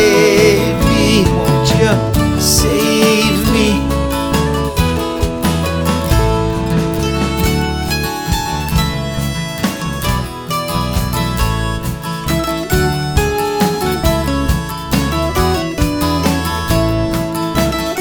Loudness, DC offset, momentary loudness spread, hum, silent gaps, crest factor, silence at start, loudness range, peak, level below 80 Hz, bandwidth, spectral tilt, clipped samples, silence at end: -15 LUFS; under 0.1%; 7 LU; none; none; 14 dB; 0 s; 6 LU; 0 dBFS; -24 dBFS; over 20 kHz; -5 dB/octave; under 0.1%; 0 s